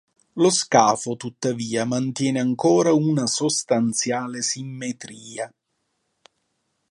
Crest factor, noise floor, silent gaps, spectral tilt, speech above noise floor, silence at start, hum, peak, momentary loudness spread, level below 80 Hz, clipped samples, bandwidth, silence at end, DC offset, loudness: 20 dB; -74 dBFS; none; -4 dB/octave; 53 dB; 0.35 s; none; -2 dBFS; 16 LU; -70 dBFS; under 0.1%; 11.5 kHz; 1.45 s; under 0.1%; -21 LUFS